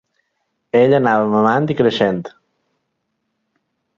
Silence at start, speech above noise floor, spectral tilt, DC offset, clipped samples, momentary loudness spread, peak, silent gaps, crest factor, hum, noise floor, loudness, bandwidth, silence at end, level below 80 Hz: 0.75 s; 58 dB; -7.5 dB/octave; under 0.1%; under 0.1%; 8 LU; -2 dBFS; none; 16 dB; none; -72 dBFS; -15 LUFS; 7.4 kHz; 1.7 s; -58 dBFS